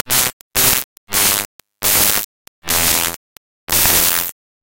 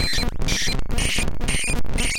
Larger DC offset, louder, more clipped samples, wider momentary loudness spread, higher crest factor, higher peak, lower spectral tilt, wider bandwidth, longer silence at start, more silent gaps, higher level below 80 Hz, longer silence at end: neither; first, -14 LUFS vs -23 LUFS; neither; first, 13 LU vs 2 LU; first, 18 dB vs 10 dB; first, 0 dBFS vs -10 dBFS; second, -0.5 dB/octave vs -2.5 dB/octave; first, over 20 kHz vs 17 kHz; about the same, 0.05 s vs 0 s; first, 0.33-0.51 s, 0.84-1.07 s, 1.45-1.59 s, 2.24-2.62 s, 3.16-3.67 s vs none; second, -40 dBFS vs -24 dBFS; first, 0.3 s vs 0 s